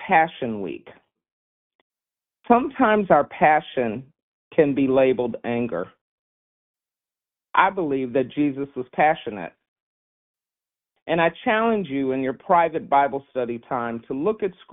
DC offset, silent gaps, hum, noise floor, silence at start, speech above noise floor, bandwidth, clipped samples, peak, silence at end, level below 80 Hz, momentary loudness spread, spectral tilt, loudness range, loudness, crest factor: under 0.1%; 1.32-1.90 s, 4.22-4.51 s, 6.01-6.74 s, 9.68-10.35 s, 11.02-11.06 s; none; under -90 dBFS; 0 s; over 69 dB; 4 kHz; under 0.1%; 0 dBFS; 0.2 s; -60 dBFS; 12 LU; -4.5 dB/octave; 5 LU; -22 LUFS; 22 dB